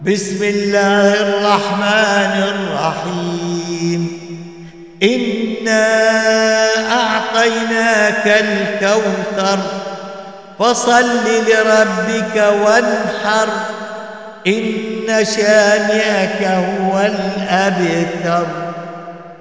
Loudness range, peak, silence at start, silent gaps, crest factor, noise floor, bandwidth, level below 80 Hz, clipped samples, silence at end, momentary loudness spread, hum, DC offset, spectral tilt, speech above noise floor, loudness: 4 LU; -2 dBFS; 0 s; none; 14 dB; -35 dBFS; 8 kHz; -60 dBFS; under 0.1%; 0.05 s; 13 LU; none; 0.3%; -4 dB/octave; 21 dB; -14 LUFS